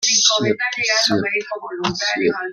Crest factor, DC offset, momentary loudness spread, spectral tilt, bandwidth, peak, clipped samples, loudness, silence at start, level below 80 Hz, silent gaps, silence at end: 18 dB; under 0.1%; 10 LU; -1.5 dB/octave; 14 kHz; -2 dBFS; under 0.1%; -17 LUFS; 0 s; -58 dBFS; none; 0 s